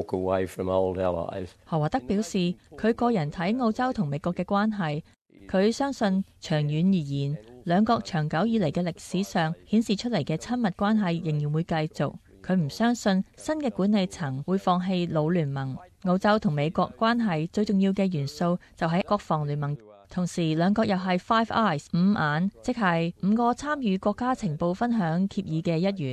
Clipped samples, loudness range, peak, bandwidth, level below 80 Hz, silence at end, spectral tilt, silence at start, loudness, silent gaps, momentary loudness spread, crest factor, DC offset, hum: under 0.1%; 2 LU; -10 dBFS; 12.5 kHz; -54 dBFS; 0 s; -7 dB/octave; 0 s; -26 LUFS; 5.21-5.25 s; 7 LU; 16 dB; under 0.1%; none